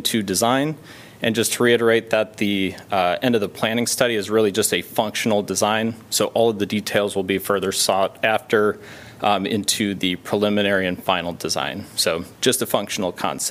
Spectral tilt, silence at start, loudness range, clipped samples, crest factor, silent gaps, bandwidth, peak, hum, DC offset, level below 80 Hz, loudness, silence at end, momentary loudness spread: -3.5 dB/octave; 0 s; 2 LU; under 0.1%; 20 dB; none; 16 kHz; 0 dBFS; none; under 0.1%; -60 dBFS; -20 LUFS; 0 s; 5 LU